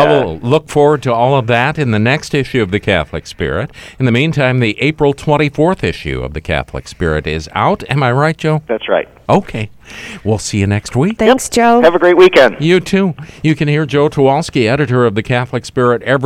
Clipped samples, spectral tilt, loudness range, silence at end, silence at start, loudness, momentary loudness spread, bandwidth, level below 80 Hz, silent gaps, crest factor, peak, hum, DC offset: under 0.1%; -6 dB/octave; 5 LU; 0 s; 0 s; -13 LUFS; 10 LU; 15 kHz; -36 dBFS; none; 12 dB; 0 dBFS; none; under 0.1%